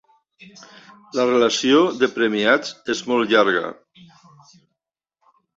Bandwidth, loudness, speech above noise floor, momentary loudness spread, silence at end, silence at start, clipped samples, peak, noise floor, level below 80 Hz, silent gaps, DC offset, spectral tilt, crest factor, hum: 8 kHz; -19 LUFS; 64 dB; 10 LU; 1.85 s; 1.15 s; under 0.1%; -2 dBFS; -83 dBFS; -66 dBFS; none; under 0.1%; -3.5 dB/octave; 18 dB; none